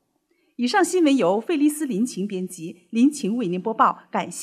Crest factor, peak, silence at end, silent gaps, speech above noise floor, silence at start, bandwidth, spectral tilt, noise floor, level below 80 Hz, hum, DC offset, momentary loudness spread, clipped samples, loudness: 18 dB; -4 dBFS; 0 s; none; 46 dB; 0.6 s; 15 kHz; -5 dB/octave; -68 dBFS; -80 dBFS; none; under 0.1%; 10 LU; under 0.1%; -22 LUFS